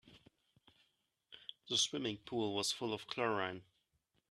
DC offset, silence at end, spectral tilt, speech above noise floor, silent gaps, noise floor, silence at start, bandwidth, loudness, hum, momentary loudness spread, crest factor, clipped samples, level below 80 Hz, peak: under 0.1%; 0.7 s; -2.5 dB/octave; 43 dB; none; -82 dBFS; 0.05 s; 13.5 kHz; -38 LUFS; none; 18 LU; 22 dB; under 0.1%; -78 dBFS; -20 dBFS